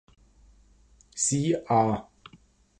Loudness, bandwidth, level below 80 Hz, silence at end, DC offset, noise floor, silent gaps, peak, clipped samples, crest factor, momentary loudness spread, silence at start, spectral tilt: -26 LUFS; 11.5 kHz; -58 dBFS; 0.8 s; under 0.1%; -59 dBFS; none; -10 dBFS; under 0.1%; 20 dB; 10 LU; 1.15 s; -5 dB/octave